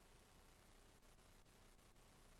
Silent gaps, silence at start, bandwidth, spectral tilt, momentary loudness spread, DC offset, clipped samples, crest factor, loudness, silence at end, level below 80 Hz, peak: none; 0 s; 13 kHz; -3.5 dB/octave; 1 LU; under 0.1%; under 0.1%; 12 dB; -70 LUFS; 0 s; -72 dBFS; -56 dBFS